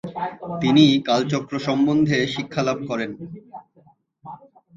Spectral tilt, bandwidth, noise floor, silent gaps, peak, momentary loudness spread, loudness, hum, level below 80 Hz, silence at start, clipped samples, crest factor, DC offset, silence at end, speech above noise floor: -6 dB/octave; 7.6 kHz; -57 dBFS; none; -2 dBFS; 23 LU; -21 LUFS; none; -60 dBFS; 0.05 s; under 0.1%; 20 dB; under 0.1%; 0.4 s; 36 dB